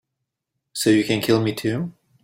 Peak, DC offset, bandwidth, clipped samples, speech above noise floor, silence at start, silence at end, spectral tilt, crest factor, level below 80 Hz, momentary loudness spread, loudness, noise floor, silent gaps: -4 dBFS; under 0.1%; 16.5 kHz; under 0.1%; 61 dB; 0.75 s; 0.35 s; -5 dB/octave; 18 dB; -58 dBFS; 13 LU; -21 LUFS; -81 dBFS; none